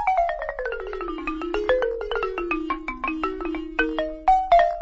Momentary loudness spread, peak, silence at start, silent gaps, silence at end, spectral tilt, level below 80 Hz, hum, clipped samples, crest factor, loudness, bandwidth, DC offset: 11 LU; -6 dBFS; 0 s; none; 0 s; -5.5 dB/octave; -40 dBFS; none; under 0.1%; 16 dB; -25 LUFS; 7.6 kHz; under 0.1%